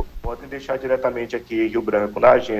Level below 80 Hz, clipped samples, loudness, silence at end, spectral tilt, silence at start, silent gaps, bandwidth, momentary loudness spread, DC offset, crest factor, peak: -42 dBFS; under 0.1%; -21 LUFS; 0 s; -6.5 dB/octave; 0 s; none; 15 kHz; 16 LU; under 0.1%; 16 dB; -4 dBFS